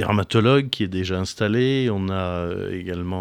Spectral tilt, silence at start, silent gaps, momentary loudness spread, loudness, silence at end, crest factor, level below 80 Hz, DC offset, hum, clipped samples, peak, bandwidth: -6.5 dB/octave; 0 s; none; 10 LU; -22 LUFS; 0 s; 18 dB; -48 dBFS; under 0.1%; none; under 0.1%; -4 dBFS; 14.5 kHz